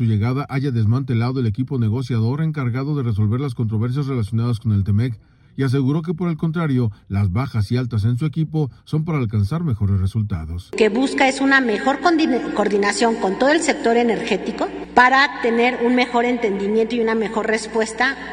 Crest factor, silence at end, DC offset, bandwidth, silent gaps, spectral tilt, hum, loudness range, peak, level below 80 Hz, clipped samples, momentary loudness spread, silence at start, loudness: 18 dB; 0 s; under 0.1%; 10 kHz; none; -6.5 dB/octave; none; 4 LU; 0 dBFS; -46 dBFS; under 0.1%; 6 LU; 0 s; -19 LUFS